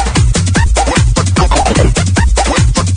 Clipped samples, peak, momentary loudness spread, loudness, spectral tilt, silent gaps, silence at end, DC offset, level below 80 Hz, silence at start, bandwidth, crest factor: under 0.1%; 0 dBFS; 1 LU; -11 LUFS; -4.5 dB/octave; none; 0 s; under 0.1%; -14 dBFS; 0 s; 10.5 kHz; 10 dB